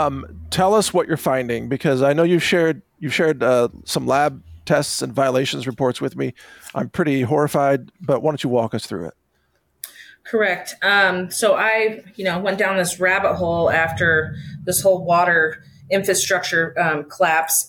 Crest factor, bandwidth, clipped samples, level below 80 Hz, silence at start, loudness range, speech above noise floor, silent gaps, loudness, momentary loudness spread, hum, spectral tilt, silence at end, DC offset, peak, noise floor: 14 dB; 19 kHz; under 0.1%; -54 dBFS; 0 s; 4 LU; 47 dB; none; -19 LUFS; 12 LU; none; -4 dB/octave; 0 s; under 0.1%; -6 dBFS; -66 dBFS